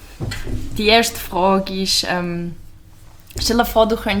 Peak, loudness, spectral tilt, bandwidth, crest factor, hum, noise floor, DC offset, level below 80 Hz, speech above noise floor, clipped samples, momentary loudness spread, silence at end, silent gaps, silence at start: -2 dBFS; -18 LUFS; -3.5 dB/octave; over 20 kHz; 18 dB; none; -42 dBFS; under 0.1%; -34 dBFS; 24 dB; under 0.1%; 14 LU; 0 s; none; 0 s